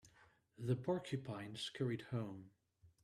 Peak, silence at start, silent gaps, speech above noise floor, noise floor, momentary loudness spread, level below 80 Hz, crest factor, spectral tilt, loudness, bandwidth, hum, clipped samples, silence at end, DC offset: -26 dBFS; 0.05 s; none; 28 dB; -71 dBFS; 9 LU; -76 dBFS; 18 dB; -6.5 dB/octave; -44 LUFS; 12.5 kHz; none; under 0.1%; 0.15 s; under 0.1%